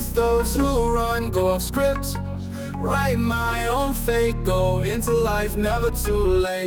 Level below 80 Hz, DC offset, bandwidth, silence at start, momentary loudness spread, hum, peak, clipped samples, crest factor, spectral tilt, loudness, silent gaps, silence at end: -30 dBFS; under 0.1%; 19.5 kHz; 0 s; 6 LU; none; -8 dBFS; under 0.1%; 14 dB; -5.5 dB/octave; -22 LUFS; none; 0 s